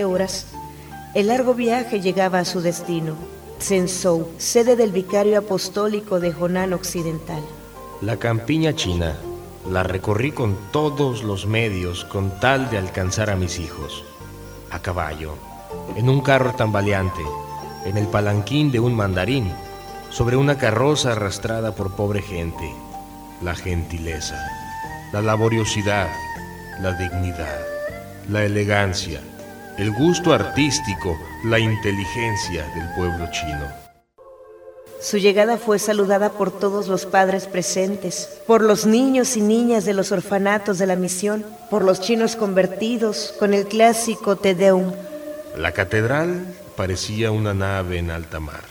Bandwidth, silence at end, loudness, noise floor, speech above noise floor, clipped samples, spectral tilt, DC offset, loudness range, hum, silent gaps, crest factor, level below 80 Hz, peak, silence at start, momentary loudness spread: over 20 kHz; 0 s; -21 LUFS; -47 dBFS; 27 dB; under 0.1%; -5 dB/octave; under 0.1%; 5 LU; none; none; 20 dB; -42 dBFS; 0 dBFS; 0 s; 15 LU